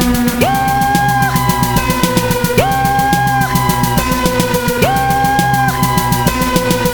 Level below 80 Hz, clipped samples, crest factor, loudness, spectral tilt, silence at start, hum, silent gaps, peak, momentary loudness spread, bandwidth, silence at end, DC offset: -28 dBFS; under 0.1%; 12 dB; -13 LUFS; -4.5 dB/octave; 0 s; none; none; 0 dBFS; 1 LU; 19.5 kHz; 0 s; under 0.1%